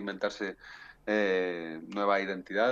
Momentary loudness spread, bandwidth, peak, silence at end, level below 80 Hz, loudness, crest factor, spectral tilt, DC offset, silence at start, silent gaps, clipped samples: 13 LU; 7.8 kHz; -14 dBFS; 0 s; -68 dBFS; -31 LUFS; 18 dB; -5 dB/octave; under 0.1%; 0 s; none; under 0.1%